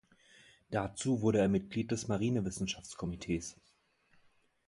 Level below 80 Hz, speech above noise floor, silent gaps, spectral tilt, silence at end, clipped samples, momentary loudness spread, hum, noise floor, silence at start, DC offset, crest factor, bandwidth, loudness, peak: -58 dBFS; 36 dB; none; -5.5 dB/octave; 1.15 s; under 0.1%; 10 LU; none; -70 dBFS; 0.7 s; under 0.1%; 18 dB; 11.5 kHz; -35 LUFS; -18 dBFS